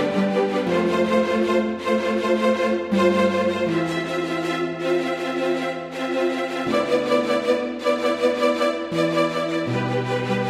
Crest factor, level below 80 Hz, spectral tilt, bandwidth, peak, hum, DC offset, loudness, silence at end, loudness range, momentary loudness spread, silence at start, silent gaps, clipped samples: 14 dB; -60 dBFS; -6 dB/octave; 14.5 kHz; -6 dBFS; none; under 0.1%; -22 LUFS; 0 s; 3 LU; 4 LU; 0 s; none; under 0.1%